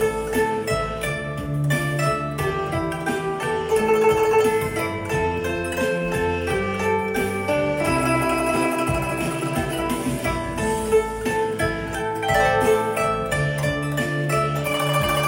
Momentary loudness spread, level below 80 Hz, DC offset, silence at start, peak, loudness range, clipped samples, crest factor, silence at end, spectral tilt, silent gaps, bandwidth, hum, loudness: 6 LU; -40 dBFS; under 0.1%; 0 s; -4 dBFS; 2 LU; under 0.1%; 16 dB; 0 s; -5 dB/octave; none; 16.5 kHz; none; -22 LUFS